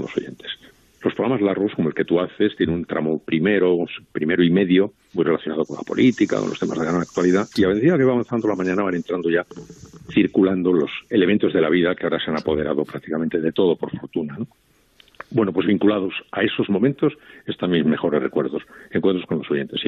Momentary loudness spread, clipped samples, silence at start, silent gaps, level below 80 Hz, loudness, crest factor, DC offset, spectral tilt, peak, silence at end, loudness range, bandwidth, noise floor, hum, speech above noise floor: 10 LU; under 0.1%; 0 s; none; -58 dBFS; -21 LUFS; 16 dB; under 0.1%; -7 dB/octave; -6 dBFS; 0 s; 3 LU; 8 kHz; -55 dBFS; none; 35 dB